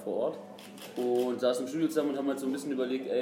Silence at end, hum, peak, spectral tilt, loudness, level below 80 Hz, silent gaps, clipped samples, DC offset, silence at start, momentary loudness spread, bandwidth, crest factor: 0 s; none; -14 dBFS; -5 dB/octave; -31 LUFS; -88 dBFS; none; under 0.1%; under 0.1%; 0 s; 13 LU; 16 kHz; 16 dB